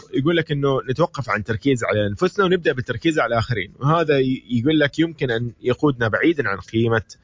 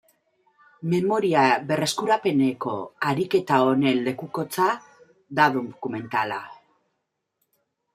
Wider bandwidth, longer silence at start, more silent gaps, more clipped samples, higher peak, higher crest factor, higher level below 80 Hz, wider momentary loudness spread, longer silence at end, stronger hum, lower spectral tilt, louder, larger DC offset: second, 7.6 kHz vs 15.5 kHz; second, 0.1 s vs 0.8 s; neither; neither; about the same, -4 dBFS vs -4 dBFS; about the same, 16 dB vs 20 dB; first, -46 dBFS vs -70 dBFS; second, 5 LU vs 11 LU; second, 0.1 s vs 1.4 s; neither; about the same, -6.5 dB/octave vs -5.5 dB/octave; first, -20 LUFS vs -23 LUFS; neither